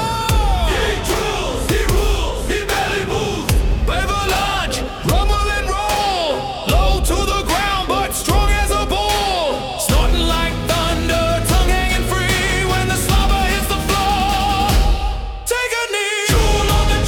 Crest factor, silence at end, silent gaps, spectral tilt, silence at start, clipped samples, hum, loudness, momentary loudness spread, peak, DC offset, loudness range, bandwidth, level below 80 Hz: 14 dB; 0 s; none; -4 dB/octave; 0 s; under 0.1%; none; -17 LUFS; 4 LU; -4 dBFS; under 0.1%; 2 LU; 18 kHz; -20 dBFS